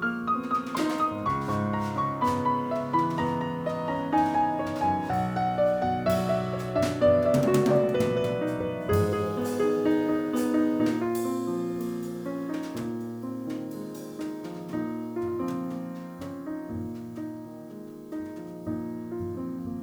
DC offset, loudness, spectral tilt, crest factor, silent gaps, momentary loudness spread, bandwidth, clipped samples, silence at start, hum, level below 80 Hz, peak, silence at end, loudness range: under 0.1%; -28 LUFS; -7 dB/octave; 16 dB; none; 13 LU; over 20 kHz; under 0.1%; 0 s; none; -56 dBFS; -10 dBFS; 0 s; 10 LU